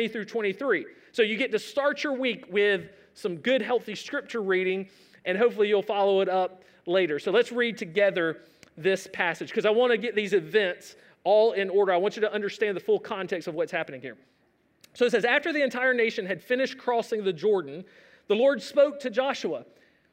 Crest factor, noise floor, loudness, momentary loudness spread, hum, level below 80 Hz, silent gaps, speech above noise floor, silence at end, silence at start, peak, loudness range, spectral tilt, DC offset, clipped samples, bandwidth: 18 dB; -67 dBFS; -26 LUFS; 10 LU; none; -80 dBFS; none; 41 dB; 0.5 s; 0 s; -8 dBFS; 3 LU; -4.5 dB/octave; under 0.1%; under 0.1%; 15.5 kHz